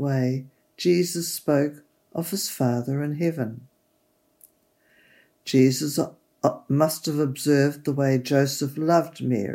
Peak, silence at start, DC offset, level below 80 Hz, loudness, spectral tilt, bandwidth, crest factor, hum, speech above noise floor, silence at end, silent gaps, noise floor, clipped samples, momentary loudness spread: -6 dBFS; 0 s; under 0.1%; -74 dBFS; -24 LUFS; -5.5 dB/octave; 16.5 kHz; 18 dB; none; 44 dB; 0 s; none; -67 dBFS; under 0.1%; 10 LU